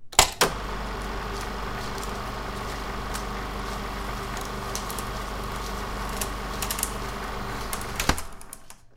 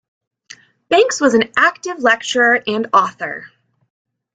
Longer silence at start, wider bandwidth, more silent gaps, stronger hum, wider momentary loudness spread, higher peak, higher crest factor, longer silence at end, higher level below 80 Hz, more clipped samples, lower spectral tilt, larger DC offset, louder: second, 0 s vs 0.9 s; first, 17 kHz vs 9.4 kHz; neither; first, 50 Hz at -45 dBFS vs none; about the same, 8 LU vs 10 LU; about the same, 0 dBFS vs 0 dBFS; first, 30 dB vs 16 dB; second, 0 s vs 0.9 s; first, -36 dBFS vs -60 dBFS; neither; about the same, -2.5 dB/octave vs -2.5 dB/octave; neither; second, -30 LUFS vs -15 LUFS